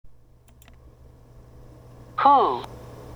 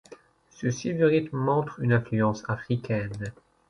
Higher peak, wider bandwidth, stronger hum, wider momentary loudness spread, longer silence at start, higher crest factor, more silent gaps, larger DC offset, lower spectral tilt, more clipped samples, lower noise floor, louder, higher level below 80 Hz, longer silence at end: first, -4 dBFS vs -10 dBFS; first, 13.5 kHz vs 10.5 kHz; neither; first, 23 LU vs 10 LU; about the same, 0.05 s vs 0.1 s; about the same, 22 dB vs 18 dB; neither; neither; about the same, -6 dB/octave vs -7 dB/octave; neither; about the same, -52 dBFS vs -52 dBFS; first, -20 LUFS vs -27 LUFS; first, -52 dBFS vs -58 dBFS; second, 0 s vs 0.4 s